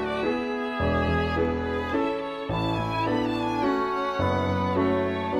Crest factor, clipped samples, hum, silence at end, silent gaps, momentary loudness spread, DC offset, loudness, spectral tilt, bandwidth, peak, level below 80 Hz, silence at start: 12 dB; under 0.1%; none; 0 s; none; 4 LU; under 0.1%; -26 LUFS; -7 dB/octave; 12 kHz; -12 dBFS; -42 dBFS; 0 s